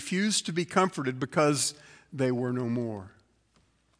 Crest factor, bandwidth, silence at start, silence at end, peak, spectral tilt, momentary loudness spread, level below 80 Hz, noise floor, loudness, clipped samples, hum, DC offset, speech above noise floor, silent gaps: 22 dB; 10.5 kHz; 0 s; 0.9 s; -8 dBFS; -4 dB/octave; 8 LU; -72 dBFS; -68 dBFS; -28 LUFS; under 0.1%; none; under 0.1%; 39 dB; none